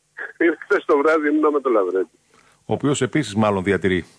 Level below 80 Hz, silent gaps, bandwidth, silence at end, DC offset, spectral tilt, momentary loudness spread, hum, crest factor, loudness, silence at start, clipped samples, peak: -56 dBFS; none; 11 kHz; 0.15 s; under 0.1%; -6 dB/octave; 7 LU; none; 14 dB; -20 LUFS; 0.2 s; under 0.1%; -6 dBFS